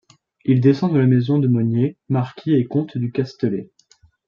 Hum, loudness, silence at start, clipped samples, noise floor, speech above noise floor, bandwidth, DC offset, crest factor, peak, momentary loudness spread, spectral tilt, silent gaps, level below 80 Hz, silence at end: none; -19 LUFS; 0.45 s; under 0.1%; -56 dBFS; 38 dB; 7 kHz; under 0.1%; 16 dB; -4 dBFS; 8 LU; -10 dB/octave; none; -62 dBFS; 0.65 s